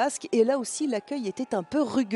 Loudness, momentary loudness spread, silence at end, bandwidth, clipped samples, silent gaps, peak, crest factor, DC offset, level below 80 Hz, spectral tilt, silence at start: -27 LUFS; 7 LU; 0 s; 12 kHz; under 0.1%; none; -10 dBFS; 16 dB; under 0.1%; -70 dBFS; -4 dB/octave; 0 s